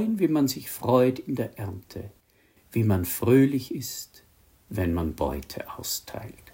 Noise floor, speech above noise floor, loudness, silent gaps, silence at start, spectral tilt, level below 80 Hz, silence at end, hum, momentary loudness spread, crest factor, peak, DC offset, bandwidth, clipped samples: -62 dBFS; 36 dB; -26 LUFS; none; 0 s; -6 dB/octave; -50 dBFS; 0.2 s; none; 18 LU; 20 dB; -6 dBFS; under 0.1%; 16.5 kHz; under 0.1%